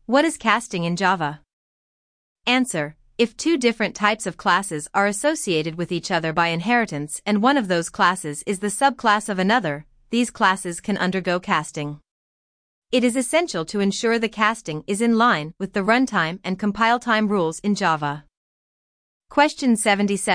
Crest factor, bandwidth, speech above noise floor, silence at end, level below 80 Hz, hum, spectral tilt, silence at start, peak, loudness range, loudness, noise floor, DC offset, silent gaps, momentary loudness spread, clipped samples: 18 dB; 10.5 kHz; over 69 dB; 0 s; -58 dBFS; none; -4 dB/octave; 0.1 s; -4 dBFS; 3 LU; -21 LUFS; under -90 dBFS; under 0.1%; 1.53-2.36 s, 12.11-12.82 s, 18.37-19.20 s; 8 LU; under 0.1%